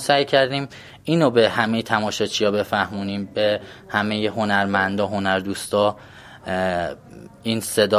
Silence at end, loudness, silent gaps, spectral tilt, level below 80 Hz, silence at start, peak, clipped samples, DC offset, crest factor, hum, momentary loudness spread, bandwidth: 0 s; -21 LUFS; none; -4.5 dB/octave; -52 dBFS; 0 s; -2 dBFS; under 0.1%; under 0.1%; 20 dB; none; 10 LU; 15.5 kHz